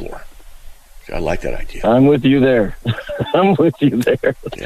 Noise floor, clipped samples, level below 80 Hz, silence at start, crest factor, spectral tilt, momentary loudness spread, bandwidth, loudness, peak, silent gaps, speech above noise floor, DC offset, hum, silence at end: -36 dBFS; under 0.1%; -32 dBFS; 0 s; 12 dB; -7.5 dB/octave; 12 LU; 14.5 kHz; -16 LUFS; -4 dBFS; none; 21 dB; under 0.1%; none; 0 s